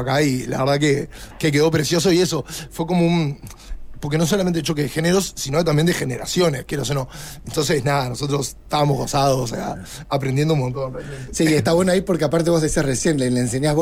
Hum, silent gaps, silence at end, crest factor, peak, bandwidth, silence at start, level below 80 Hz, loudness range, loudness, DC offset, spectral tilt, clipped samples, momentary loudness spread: none; none; 0 s; 12 dB; -6 dBFS; 16 kHz; 0 s; -40 dBFS; 2 LU; -20 LUFS; under 0.1%; -5 dB/octave; under 0.1%; 11 LU